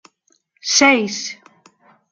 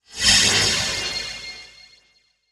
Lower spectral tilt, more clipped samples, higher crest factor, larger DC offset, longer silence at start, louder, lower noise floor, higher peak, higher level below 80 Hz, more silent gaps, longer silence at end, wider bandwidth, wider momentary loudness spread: about the same, -1.5 dB/octave vs -0.5 dB/octave; neither; about the same, 18 dB vs 20 dB; neither; first, 0.65 s vs 0.1 s; about the same, -15 LUFS vs -17 LUFS; about the same, -63 dBFS vs -62 dBFS; about the same, -2 dBFS vs -2 dBFS; second, -68 dBFS vs -44 dBFS; neither; about the same, 0.8 s vs 0.85 s; second, 10.5 kHz vs 19 kHz; about the same, 18 LU vs 20 LU